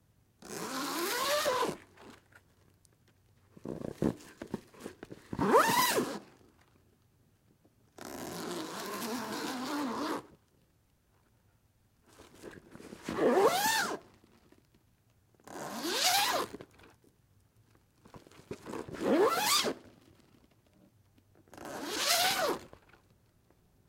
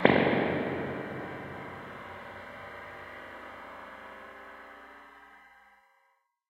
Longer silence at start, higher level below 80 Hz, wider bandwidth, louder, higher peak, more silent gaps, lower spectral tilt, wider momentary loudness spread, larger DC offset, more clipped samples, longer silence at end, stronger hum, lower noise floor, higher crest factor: first, 0.4 s vs 0 s; about the same, -68 dBFS vs -66 dBFS; about the same, 16.5 kHz vs 15.5 kHz; first, -31 LUFS vs -34 LUFS; second, -12 dBFS vs -2 dBFS; neither; second, -2.5 dB/octave vs -7.5 dB/octave; about the same, 23 LU vs 22 LU; neither; neither; first, 1.2 s vs 0.9 s; neither; about the same, -70 dBFS vs -72 dBFS; second, 24 dB vs 32 dB